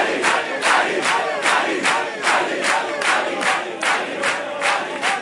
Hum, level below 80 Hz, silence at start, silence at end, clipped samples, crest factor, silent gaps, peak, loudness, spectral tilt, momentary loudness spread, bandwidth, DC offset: none; -68 dBFS; 0 s; 0 s; under 0.1%; 16 dB; none; -4 dBFS; -19 LUFS; -1.5 dB/octave; 4 LU; 11.5 kHz; under 0.1%